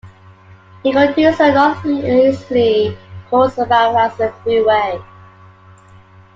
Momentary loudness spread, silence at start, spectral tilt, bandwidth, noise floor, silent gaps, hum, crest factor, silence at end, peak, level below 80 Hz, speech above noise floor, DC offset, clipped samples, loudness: 9 LU; 0.05 s; -6.5 dB/octave; 7.6 kHz; -43 dBFS; none; none; 14 dB; 1.3 s; -2 dBFS; -52 dBFS; 30 dB; under 0.1%; under 0.1%; -14 LUFS